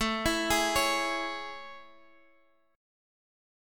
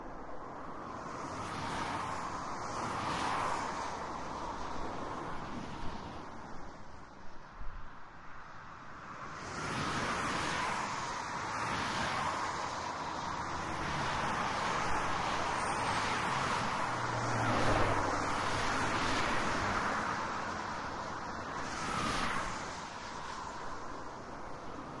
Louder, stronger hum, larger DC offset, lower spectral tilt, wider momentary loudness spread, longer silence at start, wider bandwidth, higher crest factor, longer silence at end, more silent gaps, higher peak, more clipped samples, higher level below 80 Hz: first, -28 LUFS vs -36 LUFS; neither; neither; second, -2 dB/octave vs -4 dB/octave; about the same, 17 LU vs 15 LU; about the same, 0 s vs 0 s; first, 17.5 kHz vs 11.5 kHz; about the same, 20 dB vs 20 dB; first, 0.95 s vs 0 s; neither; first, -12 dBFS vs -18 dBFS; neither; about the same, -50 dBFS vs -52 dBFS